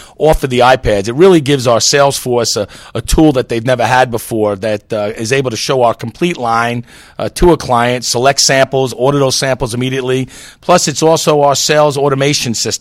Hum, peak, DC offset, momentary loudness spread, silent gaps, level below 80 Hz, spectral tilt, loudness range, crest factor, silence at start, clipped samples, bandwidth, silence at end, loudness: none; 0 dBFS; under 0.1%; 8 LU; none; -30 dBFS; -4 dB/octave; 3 LU; 12 dB; 0 s; 0.4%; 16.5 kHz; 0.05 s; -12 LUFS